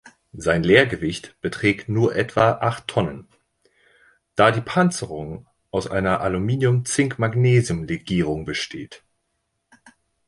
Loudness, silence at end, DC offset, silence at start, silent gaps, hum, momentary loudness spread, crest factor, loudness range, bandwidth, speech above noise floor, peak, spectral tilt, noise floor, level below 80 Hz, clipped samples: -21 LUFS; 1.3 s; under 0.1%; 0.05 s; none; none; 13 LU; 20 dB; 3 LU; 11.5 kHz; 54 dB; -2 dBFS; -5.5 dB/octave; -74 dBFS; -46 dBFS; under 0.1%